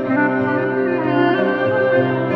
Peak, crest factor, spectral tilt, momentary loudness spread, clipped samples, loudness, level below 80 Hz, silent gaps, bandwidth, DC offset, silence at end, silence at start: -4 dBFS; 14 dB; -9 dB/octave; 3 LU; under 0.1%; -17 LUFS; -56 dBFS; none; 5.8 kHz; under 0.1%; 0 s; 0 s